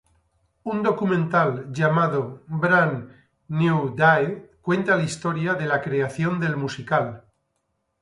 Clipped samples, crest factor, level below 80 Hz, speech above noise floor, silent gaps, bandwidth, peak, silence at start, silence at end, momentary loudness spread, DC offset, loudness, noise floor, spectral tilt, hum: under 0.1%; 18 dB; -60 dBFS; 52 dB; none; 11.5 kHz; -4 dBFS; 0.65 s; 0.8 s; 10 LU; under 0.1%; -22 LUFS; -74 dBFS; -7 dB/octave; none